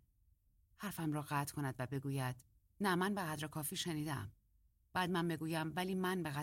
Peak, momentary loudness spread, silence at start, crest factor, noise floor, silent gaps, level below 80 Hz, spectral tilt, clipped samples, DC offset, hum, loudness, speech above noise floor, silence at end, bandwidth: -24 dBFS; 7 LU; 0.8 s; 18 dB; -74 dBFS; none; -70 dBFS; -5 dB/octave; under 0.1%; under 0.1%; none; -40 LUFS; 34 dB; 0 s; 16.5 kHz